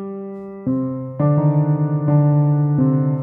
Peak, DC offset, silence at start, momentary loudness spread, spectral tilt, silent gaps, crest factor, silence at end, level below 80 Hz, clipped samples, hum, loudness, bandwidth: -4 dBFS; under 0.1%; 0 s; 12 LU; -14.5 dB/octave; none; 12 dB; 0 s; -58 dBFS; under 0.1%; none; -18 LUFS; 2.4 kHz